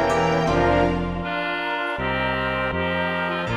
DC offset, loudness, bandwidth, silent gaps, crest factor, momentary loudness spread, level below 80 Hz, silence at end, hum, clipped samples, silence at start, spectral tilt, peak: under 0.1%; -22 LUFS; 12.5 kHz; none; 16 dB; 6 LU; -38 dBFS; 0 s; none; under 0.1%; 0 s; -6 dB/octave; -8 dBFS